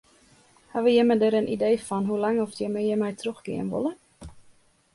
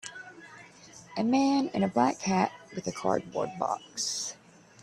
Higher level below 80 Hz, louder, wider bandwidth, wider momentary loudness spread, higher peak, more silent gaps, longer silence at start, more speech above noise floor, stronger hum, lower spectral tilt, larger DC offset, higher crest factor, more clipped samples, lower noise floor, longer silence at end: first, -60 dBFS vs -68 dBFS; first, -25 LUFS vs -29 LUFS; second, 11.5 kHz vs 14 kHz; second, 12 LU vs 23 LU; about the same, -10 dBFS vs -10 dBFS; neither; first, 0.75 s vs 0.05 s; first, 34 dB vs 23 dB; neither; first, -6 dB/octave vs -4.5 dB/octave; neither; about the same, 16 dB vs 20 dB; neither; first, -58 dBFS vs -52 dBFS; about the same, 0.55 s vs 0.5 s